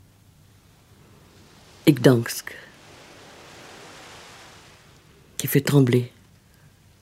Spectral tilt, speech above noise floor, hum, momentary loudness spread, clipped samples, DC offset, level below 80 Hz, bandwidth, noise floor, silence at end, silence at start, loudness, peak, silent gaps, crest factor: -6 dB/octave; 35 dB; none; 27 LU; under 0.1%; under 0.1%; -62 dBFS; 16 kHz; -54 dBFS; 0.95 s; 1.85 s; -21 LUFS; -2 dBFS; none; 24 dB